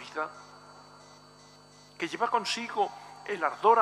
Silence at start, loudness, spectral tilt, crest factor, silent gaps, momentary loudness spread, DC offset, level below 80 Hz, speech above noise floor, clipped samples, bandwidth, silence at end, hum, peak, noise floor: 0 s; -30 LUFS; -3 dB/octave; 22 dB; none; 24 LU; under 0.1%; -74 dBFS; 27 dB; under 0.1%; 13 kHz; 0 s; 50 Hz at -65 dBFS; -8 dBFS; -55 dBFS